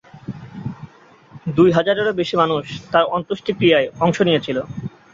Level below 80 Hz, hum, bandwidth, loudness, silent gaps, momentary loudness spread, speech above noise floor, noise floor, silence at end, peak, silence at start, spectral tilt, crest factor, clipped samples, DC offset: -52 dBFS; none; 7.6 kHz; -18 LUFS; none; 17 LU; 30 dB; -47 dBFS; 0.25 s; -2 dBFS; 0.15 s; -6.5 dB/octave; 18 dB; under 0.1%; under 0.1%